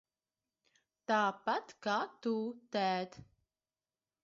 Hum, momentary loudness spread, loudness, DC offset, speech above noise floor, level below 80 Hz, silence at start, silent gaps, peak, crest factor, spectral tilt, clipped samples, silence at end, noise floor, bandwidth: none; 7 LU; -36 LUFS; under 0.1%; over 54 dB; -78 dBFS; 1.1 s; none; -20 dBFS; 18 dB; -2.5 dB/octave; under 0.1%; 1.05 s; under -90 dBFS; 7.6 kHz